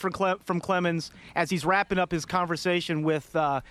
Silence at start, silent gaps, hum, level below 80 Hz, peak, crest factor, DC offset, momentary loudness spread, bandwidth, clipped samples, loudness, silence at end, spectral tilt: 0 s; none; none; -56 dBFS; -8 dBFS; 18 dB; under 0.1%; 5 LU; 14.5 kHz; under 0.1%; -27 LUFS; 0 s; -5.5 dB/octave